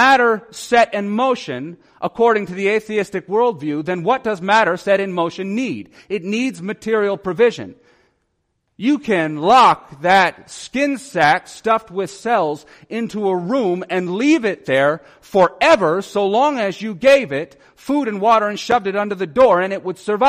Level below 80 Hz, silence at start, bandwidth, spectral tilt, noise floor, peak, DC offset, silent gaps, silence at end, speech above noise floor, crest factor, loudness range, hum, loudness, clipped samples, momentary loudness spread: -56 dBFS; 0 s; 14.5 kHz; -5 dB/octave; -70 dBFS; -2 dBFS; under 0.1%; none; 0 s; 52 dB; 16 dB; 4 LU; none; -17 LUFS; under 0.1%; 12 LU